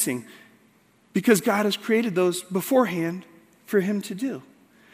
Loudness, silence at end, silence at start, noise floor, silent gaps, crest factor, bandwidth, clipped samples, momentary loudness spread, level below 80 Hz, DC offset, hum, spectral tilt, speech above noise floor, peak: -24 LUFS; 0.55 s; 0 s; -60 dBFS; none; 20 dB; 16 kHz; under 0.1%; 11 LU; -74 dBFS; under 0.1%; none; -4.5 dB/octave; 36 dB; -6 dBFS